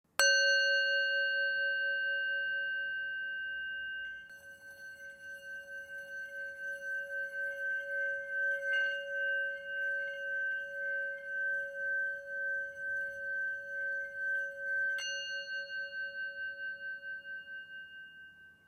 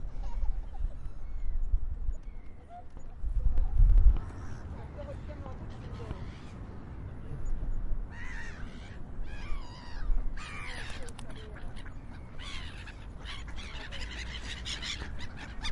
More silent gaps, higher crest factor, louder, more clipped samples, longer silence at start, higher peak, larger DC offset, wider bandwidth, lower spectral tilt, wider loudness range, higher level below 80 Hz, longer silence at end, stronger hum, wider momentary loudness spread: neither; about the same, 24 dB vs 22 dB; first, -34 LUFS vs -38 LUFS; neither; first, 0.2 s vs 0 s; second, -12 dBFS vs -8 dBFS; neither; first, 16 kHz vs 10.5 kHz; second, 2 dB/octave vs -5 dB/octave; about the same, 9 LU vs 10 LU; second, -80 dBFS vs -32 dBFS; first, 0.15 s vs 0 s; neither; first, 16 LU vs 12 LU